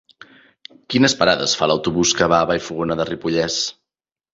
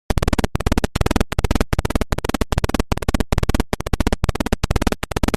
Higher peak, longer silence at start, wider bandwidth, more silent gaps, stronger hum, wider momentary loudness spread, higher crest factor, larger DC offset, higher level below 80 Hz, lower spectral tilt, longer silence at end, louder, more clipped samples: about the same, -2 dBFS vs 0 dBFS; first, 0.9 s vs 0.1 s; second, 8 kHz vs 15 kHz; neither; neither; first, 8 LU vs 2 LU; about the same, 18 dB vs 18 dB; neither; second, -48 dBFS vs -24 dBFS; second, -3.5 dB/octave vs -5.5 dB/octave; first, 0.6 s vs 0 s; first, -18 LUFS vs -21 LUFS; neither